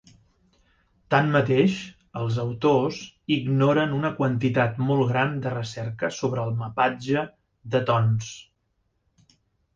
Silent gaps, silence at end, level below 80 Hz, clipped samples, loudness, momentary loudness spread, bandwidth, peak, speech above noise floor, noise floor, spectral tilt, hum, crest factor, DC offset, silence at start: none; 1.35 s; -58 dBFS; under 0.1%; -24 LUFS; 10 LU; 7.6 kHz; -6 dBFS; 49 dB; -72 dBFS; -7 dB/octave; none; 20 dB; under 0.1%; 1.1 s